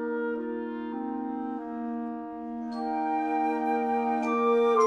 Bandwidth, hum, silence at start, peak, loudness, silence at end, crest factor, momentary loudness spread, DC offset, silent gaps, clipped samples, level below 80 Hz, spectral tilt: 8 kHz; none; 0 s; -12 dBFS; -30 LUFS; 0 s; 16 dB; 10 LU; under 0.1%; none; under 0.1%; -68 dBFS; -5.5 dB/octave